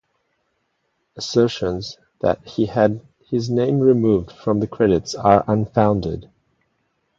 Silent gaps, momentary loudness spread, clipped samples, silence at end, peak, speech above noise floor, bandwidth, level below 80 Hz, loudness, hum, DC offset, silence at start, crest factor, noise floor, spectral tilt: none; 12 LU; under 0.1%; 0.95 s; -2 dBFS; 52 dB; 7.8 kHz; -46 dBFS; -19 LUFS; none; under 0.1%; 1.15 s; 20 dB; -71 dBFS; -7 dB/octave